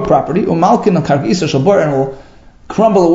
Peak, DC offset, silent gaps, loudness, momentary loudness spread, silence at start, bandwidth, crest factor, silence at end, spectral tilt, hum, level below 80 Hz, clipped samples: 0 dBFS; under 0.1%; none; -13 LUFS; 6 LU; 0 s; 7.8 kHz; 12 dB; 0 s; -7 dB/octave; none; -42 dBFS; under 0.1%